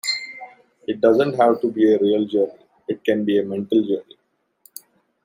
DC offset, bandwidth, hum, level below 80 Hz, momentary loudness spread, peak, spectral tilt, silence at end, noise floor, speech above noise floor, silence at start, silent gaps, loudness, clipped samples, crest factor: under 0.1%; 16 kHz; none; -70 dBFS; 21 LU; -2 dBFS; -5.5 dB/octave; 1.25 s; -57 dBFS; 39 dB; 0.05 s; none; -20 LUFS; under 0.1%; 18 dB